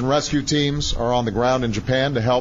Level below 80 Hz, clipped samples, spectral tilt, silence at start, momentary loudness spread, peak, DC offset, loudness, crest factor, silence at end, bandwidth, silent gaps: -34 dBFS; under 0.1%; -5 dB/octave; 0 s; 2 LU; -6 dBFS; under 0.1%; -20 LUFS; 14 dB; 0 s; 8 kHz; none